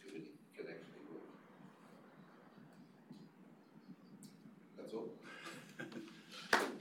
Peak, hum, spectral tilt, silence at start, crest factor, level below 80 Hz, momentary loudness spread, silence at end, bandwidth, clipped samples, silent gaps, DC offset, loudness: -20 dBFS; none; -3.5 dB/octave; 0 s; 28 dB; -88 dBFS; 14 LU; 0 s; 17 kHz; under 0.1%; none; under 0.1%; -46 LUFS